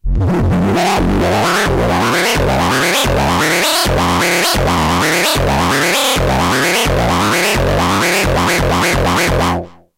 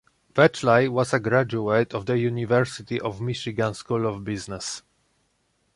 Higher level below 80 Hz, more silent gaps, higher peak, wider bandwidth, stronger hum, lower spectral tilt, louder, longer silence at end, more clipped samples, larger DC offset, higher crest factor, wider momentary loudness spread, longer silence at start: first, -24 dBFS vs -56 dBFS; neither; about the same, -2 dBFS vs -4 dBFS; first, 16.5 kHz vs 11.5 kHz; neither; second, -4 dB/octave vs -5.5 dB/octave; first, -13 LUFS vs -24 LUFS; second, 0.25 s vs 0.95 s; neither; neither; second, 10 dB vs 20 dB; second, 2 LU vs 12 LU; second, 0.05 s vs 0.35 s